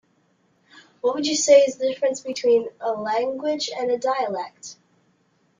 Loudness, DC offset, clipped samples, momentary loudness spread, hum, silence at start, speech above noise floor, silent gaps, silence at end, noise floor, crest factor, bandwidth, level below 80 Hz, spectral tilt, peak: -22 LUFS; under 0.1%; under 0.1%; 13 LU; none; 1.05 s; 43 dB; none; 0.85 s; -65 dBFS; 20 dB; 9.6 kHz; -70 dBFS; -2 dB/octave; -4 dBFS